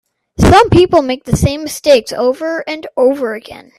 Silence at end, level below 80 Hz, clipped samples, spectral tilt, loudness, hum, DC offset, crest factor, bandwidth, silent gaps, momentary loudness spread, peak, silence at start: 0.2 s; -30 dBFS; under 0.1%; -5.5 dB/octave; -12 LUFS; none; under 0.1%; 12 dB; 14.5 kHz; none; 13 LU; 0 dBFS; 0.4 s